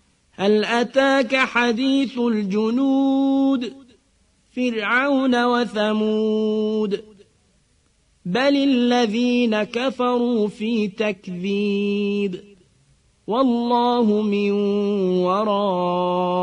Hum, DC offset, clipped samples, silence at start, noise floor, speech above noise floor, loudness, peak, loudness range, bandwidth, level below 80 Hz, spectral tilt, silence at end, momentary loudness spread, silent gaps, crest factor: none; under 0.1%; under 0.1%; 0.4 s; -61 dBFS; 42 dB; -20 LUFS; -4 dBFS; 4 LU; 10 kHz; -62 dBFS; -6 dB/octave; 0 s; 7 LU; none; 16 dB